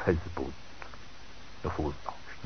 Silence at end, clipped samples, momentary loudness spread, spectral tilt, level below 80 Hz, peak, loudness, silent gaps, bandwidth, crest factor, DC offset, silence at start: 0 s; under 0.1%; 17 LU; -6 dB/octave; -46 dBFS; -12 dBFS; -37 LUFS; none; 6.4 kHz; 24 dB; 0.8%; 0 s